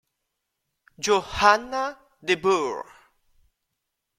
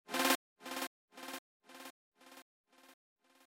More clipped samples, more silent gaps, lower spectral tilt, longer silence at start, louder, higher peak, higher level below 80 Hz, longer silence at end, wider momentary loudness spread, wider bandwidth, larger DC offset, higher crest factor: neither; second, none vs 0.35-0.56 s, 0.87-1.08 s, 1.38-1.60 s, 1.90-2.12 s, 2.42-2.64 s; first, -3 dB/octave vs -0.5 dB/octave; first, 1 s vs 0.1 s; first, -23 LUFS vs -38 LUFS; first, -2 dBFS vs -16 dBFS; first, -54 dBFS vs under -90 dBFS; first, 1.35 s vs 0.6 s; second, 13 LU vs 26 LU; second, 14.5 kHz vs 16.5 kHz; neither; about the same, 24 dB vs 26 dB